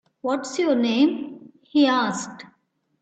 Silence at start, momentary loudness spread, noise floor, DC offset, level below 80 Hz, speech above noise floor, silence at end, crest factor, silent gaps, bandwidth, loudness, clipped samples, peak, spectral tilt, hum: 0.25 s; 14 LU; -68 dBFS; under 0.1%; -70 dBFS; 47 dB; 0.55 s; 16 dB; none; 9 kHz; -22 LUFS; under 0.1%; -8 dBFS; -4 dB/octave; none